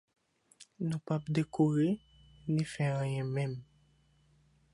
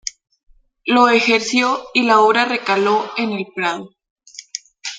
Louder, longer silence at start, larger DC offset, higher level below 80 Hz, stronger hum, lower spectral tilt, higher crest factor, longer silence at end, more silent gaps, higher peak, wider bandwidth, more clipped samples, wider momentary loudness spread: second, -33 LUFS vs -16 LUFS; first, 0.6 s vs 0.05 s; neither; about the same, -66 dBFS vs -64 dBFS; neither; first, -7.5 dB/octave vs -3 dB/octave; about the same, 18 dB vs 16 dB; first, 1.1 s vs 0 s; second, none vs 0.43-0.47 s, 4.10-4.16 s; second, -18 dBFS vs -2 dBFS; first, 11.5 kHz vs 9.4 kHz; neither; second, 10 LU vs 17 LU